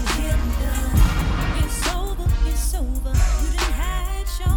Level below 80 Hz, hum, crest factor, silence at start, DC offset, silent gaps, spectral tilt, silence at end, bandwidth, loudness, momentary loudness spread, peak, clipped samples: -20 dBFS; none; 14 dB; 0 s; under 0.1%; none; -4.5 dB/octave; 0 s; 18.5 kHz; -23 LUFS; 6 LU; -4 dBFS; under 0.1%